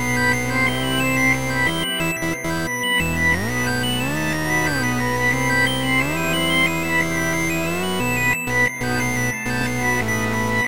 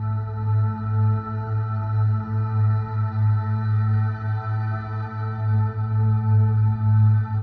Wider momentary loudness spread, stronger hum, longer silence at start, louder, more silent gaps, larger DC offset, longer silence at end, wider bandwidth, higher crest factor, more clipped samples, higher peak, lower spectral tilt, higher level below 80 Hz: second, 4 LU vs 8 LU; neither; about the same, 0 s vs 0 s; first, -19 LUFS vs -23 LUFS; neither; first, 2% vs under 0.1%; about the same, 0 s vs 0 s; first, 16 kHz vs 4.2 kHz; about the same, 14 dB vs 10 dB; neither; first, -6 dBFS vs -10 dBFS; second, -4 dB/octave vs -11.5 dB/octave; first, -40 dBFS vs -48 dBFS